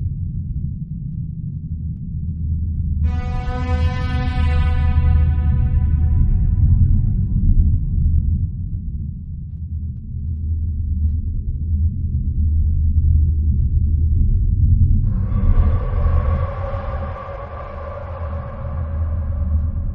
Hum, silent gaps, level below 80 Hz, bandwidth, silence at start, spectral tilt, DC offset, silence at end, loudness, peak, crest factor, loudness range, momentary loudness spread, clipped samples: none; none; -20 dBFS; 4.5 kHz; 0 s; -10 dB/octave; under 0.1%; 0 s; -21 LUFS; -2 dBFS; 14 dB; 7 LU; 11 LU; under 0.1%